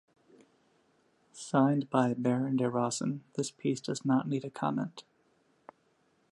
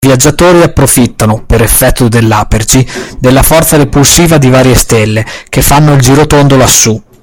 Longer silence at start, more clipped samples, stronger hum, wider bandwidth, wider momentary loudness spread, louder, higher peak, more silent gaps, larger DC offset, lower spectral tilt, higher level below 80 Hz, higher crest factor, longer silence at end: first, 1.35 s vs 0 s; second, under 0.1% vs 6%; neither; second, 11.5 kHz vs over 20 kHz; first, 9 LU vs 5 LU; second, -31 LUFS vs -5 LUFS; second, -12 dBFS vs 0 dBFS; neither; neither; first, -6 dB/octave vs -4.5 dB/octave; second, -78 dBFS vs -18 dBFS; first, 20 dB vs 6 dB; first, 1.3 s vs 0.2 s